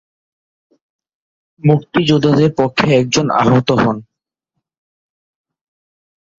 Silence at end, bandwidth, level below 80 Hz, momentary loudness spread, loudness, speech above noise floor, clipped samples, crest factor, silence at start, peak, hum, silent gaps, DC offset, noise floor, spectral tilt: 2.35 s; 7.8 kHz; -50 dBFS; 4 LU; -14 LUFS; 68 dB; under 0.1%; 16 dB; 1.65 s; -2 dBFS; none; none; under 0.1%; -80 dBFS; -6 dB/octave